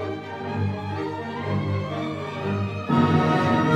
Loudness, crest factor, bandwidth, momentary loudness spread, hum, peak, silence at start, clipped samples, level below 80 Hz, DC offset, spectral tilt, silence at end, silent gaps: -25 LUFS; 16 dB; 9.8 kHz; 10 LU; none; -8 dBFS; 0 s; under 0.1%; -60 dBFS; under 0.1%; -7.5 dB/octave; 0 s; none